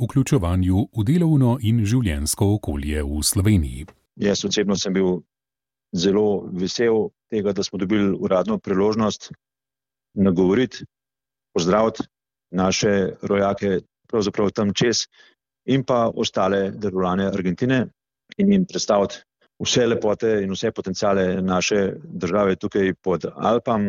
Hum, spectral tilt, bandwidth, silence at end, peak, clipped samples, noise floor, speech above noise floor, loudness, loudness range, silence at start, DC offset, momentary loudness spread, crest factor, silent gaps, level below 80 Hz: none; -5.5 dB/octave; 16.5 kHz; 0 s; -6 dBFS; under 0.1%; under -90 dBFS; over 70 dB; -21 LUFS; 2 LU; 0 s; under 0.1%; 8 LU; 16 dB; none; -40 dBFS